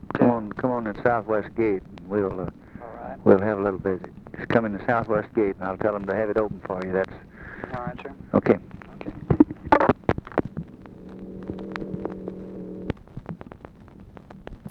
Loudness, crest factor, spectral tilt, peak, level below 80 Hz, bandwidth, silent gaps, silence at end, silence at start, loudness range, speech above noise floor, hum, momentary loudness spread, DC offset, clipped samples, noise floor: -25 LUFS; 24 dB; -9.5 dB/octave; -2 dBFS; -48 dBFS; 6.8 kHz; none; 0 s; 0 s; 12 LU; 22 dB; none; 21 LU; under 0.1%; under 0.1%; -46 dBFS